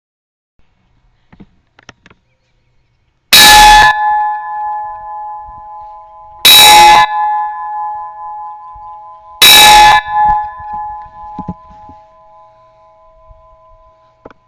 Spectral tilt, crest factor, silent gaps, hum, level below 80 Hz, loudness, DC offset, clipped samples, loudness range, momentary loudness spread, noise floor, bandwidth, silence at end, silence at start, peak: 0.5 dB/octave; 12 dB; none; none; -34 dBFS; -4 LUFS; under 0.1%; 0.9%; 3 LU; 26 LU; -57 dBFS; over 20 kHz; 2.95 s; 3.3 s; 0 dBFS